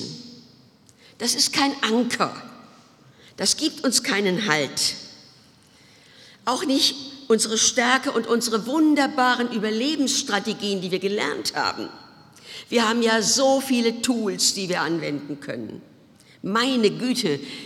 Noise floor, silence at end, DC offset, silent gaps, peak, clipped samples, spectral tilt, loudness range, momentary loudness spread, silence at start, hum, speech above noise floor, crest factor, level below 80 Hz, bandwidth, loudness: -54 dBFS; 0 s; under 0.1%; none; -2 dBFS; under 0.1%; -2.5 dB/octave; 4 LU; 14 LU; 0 s; none; 31 dB; 22 dB; -68 dBFS; 17 kHz; -22 LUFS